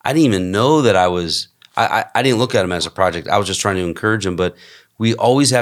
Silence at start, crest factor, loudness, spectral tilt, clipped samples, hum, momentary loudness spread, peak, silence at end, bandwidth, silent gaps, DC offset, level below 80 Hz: 0.05 s; 16 dB; -16 LUFS; -4.5 dB/octave; under 0.1%; none; 7 LU; 0 dBFS; 0 s; 15.5 kHz; none; under 0.1%; -54 dBFS